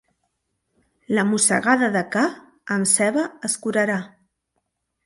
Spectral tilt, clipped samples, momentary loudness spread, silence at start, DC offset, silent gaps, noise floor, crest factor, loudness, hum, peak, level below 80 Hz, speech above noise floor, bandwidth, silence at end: -3.5 dB/octave; under 0.1%; 9 LU; 1.1 s; under 0.1%; none; -75 dBFS; 20 dB; -20 LUFS; none; -2 dBFS; -68 dBFS; 55 dB; 12 kHz; 1 s